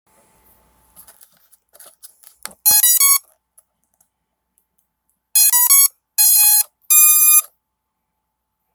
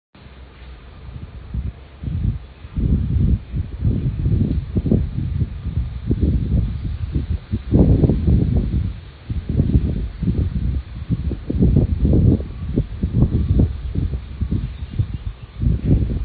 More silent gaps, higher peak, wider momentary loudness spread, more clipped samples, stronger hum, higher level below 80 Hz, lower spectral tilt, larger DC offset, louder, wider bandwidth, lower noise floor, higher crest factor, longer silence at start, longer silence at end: neither; about the same, 0 dBFS vs 0 dBFS; second, 7 LU vs 14 LU; neither; neither; second, -68 dBFS vs -24 dBFS; second, 4.5 dB/octave vs -14 dB/octave; neither; first, -10 LUFS vs -21 LUFS; first, over 20 kHz vs 4.7 kHz; first, -76 dBFS vs -40 dBFS; about the same, 18 dB vs 18 dB; first, 2.65 s vs 0.2 s; first, 1.3 s vs 0 s